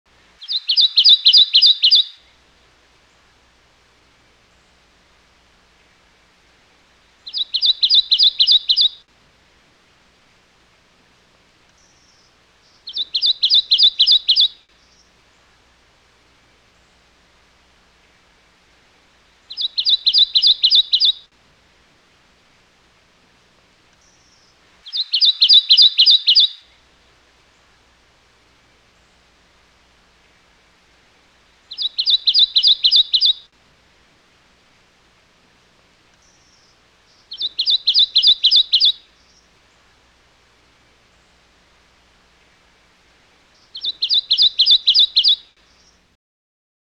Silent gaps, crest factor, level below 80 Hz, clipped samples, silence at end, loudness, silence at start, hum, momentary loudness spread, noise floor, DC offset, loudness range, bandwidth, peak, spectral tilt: none; 18 dB; -62 dBFS; under 0.1%; 1.6 s; -12 LUFS; 0.4 s; none; 15 LU; -55 dBFS; under 0.1%; 12 LU; 10 kHz; -2 dBFS; 2 dB/octave